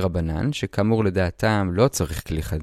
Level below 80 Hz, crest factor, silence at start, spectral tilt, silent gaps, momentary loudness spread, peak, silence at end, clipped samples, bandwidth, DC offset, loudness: -36 dBFS; 18 dB; 0 s; -6 dB/octave; none; 6 LU; -4 dBFS; 0 s; under 0.1%; 15.5 kHz; under 0.1%; -23 LUFS